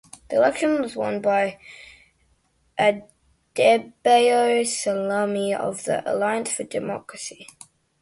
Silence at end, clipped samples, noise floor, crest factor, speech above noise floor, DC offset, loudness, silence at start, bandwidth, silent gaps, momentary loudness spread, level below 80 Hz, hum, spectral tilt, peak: 0.6 s; under 0.1%; -65 dBFS; 18 dB; 43 dB; under 0.1%; -22 LUFS; 0.3 s; 11.5 kHz; none; 16 LU; -64 dBFS; none; -3.5 dB/octave; -6 dBFS